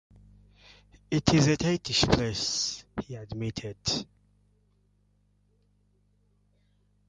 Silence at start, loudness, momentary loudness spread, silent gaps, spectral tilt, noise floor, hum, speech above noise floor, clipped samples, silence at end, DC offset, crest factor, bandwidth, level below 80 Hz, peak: 1.1 s; -28 LUFS; 15 LU; none; -4.5 dB/octave; -68 dBFS; 50 Hz at -55 dBFS; 40 dB; under 0.1%; 3.05 s; under 0.1%; 26 dB; 10.5 kHz; -48 dBFS; -6 dBFS